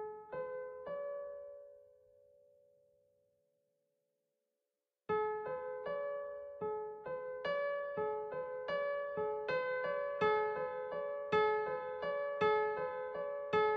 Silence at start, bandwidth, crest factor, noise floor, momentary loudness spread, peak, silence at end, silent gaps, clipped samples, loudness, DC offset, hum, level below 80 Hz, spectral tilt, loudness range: 0 s; 6.2 kHz; 18 dB; under -90 dBFS; 11 LU; -20 dBFS; 0 s; none; under 0.1%; -38 LUFS; under 0.1%; none; -76 dBFS; -2.5 dB/octave; 12 LU